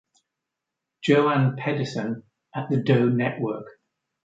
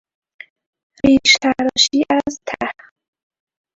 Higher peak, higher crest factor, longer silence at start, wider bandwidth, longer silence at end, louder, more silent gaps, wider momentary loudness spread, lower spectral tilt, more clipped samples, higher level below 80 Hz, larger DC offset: second, -6 dBFS vs 0 dBFS; about the same, 20 dB vs 18 dB; about the same, 1 s vs 1.05 s; about the same, 7.8 kHz vs 7.8 kHz; second, 0.55 s vs 1.05 s; second, -24 LUFS vs -15 LUFS; neither; about the same, 15 LU vs 14 LU; first, -7.5 dB/octave vs -2 dB/octave; neither; second, -68 dBFS vs -50 dBFS; neither